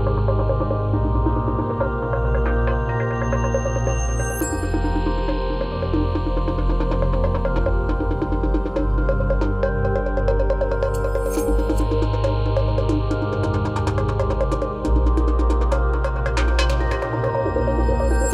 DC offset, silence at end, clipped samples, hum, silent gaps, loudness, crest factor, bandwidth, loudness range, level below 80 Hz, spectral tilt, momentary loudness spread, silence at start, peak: under 0.1%; 0 s; under 0.1%; none; none; -22 LUFS; 14 dB; 14 kHz; 2 LU; -22 dBFS; -7 dB/octave; 3 LU; 0 s; -6 dBFS